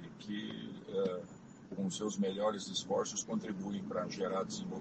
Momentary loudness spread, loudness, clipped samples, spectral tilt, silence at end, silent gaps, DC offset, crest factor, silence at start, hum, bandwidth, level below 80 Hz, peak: 10 LU; -38 LUFS; under 0.1%; -4.5 dB/octave; 0 s; none; under 0.1%; 16 dB; 0 s; none; 8.8 kHz; -74 dBFS; -22 dBFS